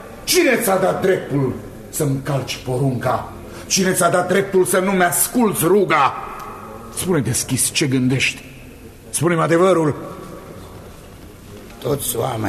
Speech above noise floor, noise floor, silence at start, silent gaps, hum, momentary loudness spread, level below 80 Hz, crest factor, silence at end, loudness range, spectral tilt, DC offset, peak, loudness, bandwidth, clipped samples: 21 dB; -39 dBFS; 0 s; none; none; 20 LU; -46 dBFS; 16 dB; 0 s; 4 LU; -4 dB/octave; under 0.1%; -2 dBFS; -18 LUFS; 14 kHz; under 0.1%